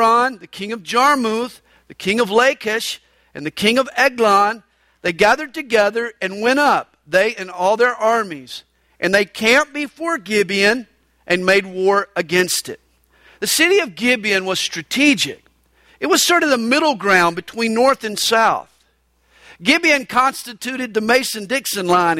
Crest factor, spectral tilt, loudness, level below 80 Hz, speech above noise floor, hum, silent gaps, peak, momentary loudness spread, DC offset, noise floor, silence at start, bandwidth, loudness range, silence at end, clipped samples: 16 dB; -3 dB/octave; -17 LUFS; -58 dBFS; 44 dB; none; none; -2 dBFS; 11 LU; under 0.1%; -61 dBFS; 0 s; 16.5 kHz; 2 LU; 0 s; under 0.1%